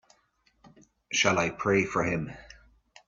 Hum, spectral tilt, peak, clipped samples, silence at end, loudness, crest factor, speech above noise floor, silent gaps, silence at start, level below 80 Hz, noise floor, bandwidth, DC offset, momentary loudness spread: none; -4 dB/octave; -8 dBFS; under 0.1%; 0.6 s; -27 LUFS; 22 dB; 42 dB; none; 1.1 s; -58 dBFS; -69 dBFS; 7.8 kHz; under 0.1%; 13 LU